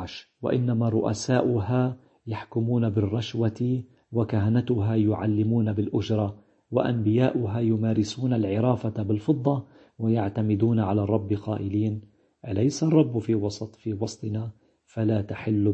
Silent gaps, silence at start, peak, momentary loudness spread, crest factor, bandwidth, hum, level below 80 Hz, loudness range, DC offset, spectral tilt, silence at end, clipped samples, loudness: none; 0 s; -6 dBFS; 9 LU; 18 dB; 8.4 kHz; none; -60 dBFS; 2 LU; under 0.1%; -7.5 dB/octave; 0 s; under 0.1%; -26 LUFS